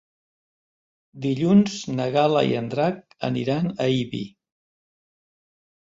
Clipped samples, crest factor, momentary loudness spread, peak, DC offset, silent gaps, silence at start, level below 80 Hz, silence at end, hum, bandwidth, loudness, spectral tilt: under 0.1%; 18 dB; 12 LU; -6 dBFS; under 0.1%; none; 1.15 s; -62 dBFS; 1.65 s; none; 7.8 kHz; -23 LUFS; -6.5 dB/octave